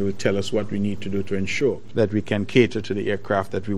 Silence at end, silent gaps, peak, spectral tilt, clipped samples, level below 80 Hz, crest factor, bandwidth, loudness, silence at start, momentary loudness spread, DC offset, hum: 0 s; none; -2 dBFS; -6 dB/octave; under 0.1%; -54 dBFS; 20 dB; 12.5 kHz; -23 LUFS; 0 s; 7 LU; 3%; none